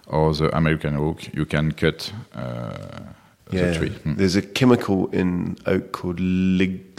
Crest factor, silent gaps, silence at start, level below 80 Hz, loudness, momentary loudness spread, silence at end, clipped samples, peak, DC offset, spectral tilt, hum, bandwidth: 20 dB; none; 0.05 s; -42 dBFS; -22 LUFS; 13 LU; 0.1 s; under 0.1%; -2 dBFS; under 0.1%; -6.5 dB/octave; none; 14.5 kHz